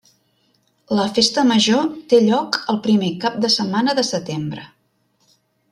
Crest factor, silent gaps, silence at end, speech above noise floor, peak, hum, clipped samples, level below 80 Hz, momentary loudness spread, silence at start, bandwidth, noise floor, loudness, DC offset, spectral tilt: 18 dB; none; 1.05 s; 47 dB; -2 dBFS; none; under 0.1%; -62 dBFS; 10 LU; 0.9 s; 12 kHz; -64 dBFS; -18 LUFS; under 0.1%; -4.5 dB/octave